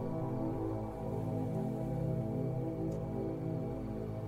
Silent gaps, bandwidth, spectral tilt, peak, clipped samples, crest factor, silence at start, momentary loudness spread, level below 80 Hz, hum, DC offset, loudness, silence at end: none; 15 kHz; -10 dB/octave; -24 dBFS; under 0.1%; 12 dB; 0 s; 3 LU; -52 dBFS; none; under 0.1%; -38 LUFS; 0 s